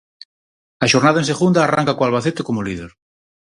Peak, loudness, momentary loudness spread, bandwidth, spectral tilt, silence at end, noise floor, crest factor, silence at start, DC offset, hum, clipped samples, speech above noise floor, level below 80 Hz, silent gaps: 0 dBFS; -17 LUFS; 10 LU; 11.5 kHz; -5 dB/octave; 0.7 s; under -90 dBFS; 18 dB; 0.8 s; under 0.1%; none; under 0.1%; over 73 dB; -52 dBFS; none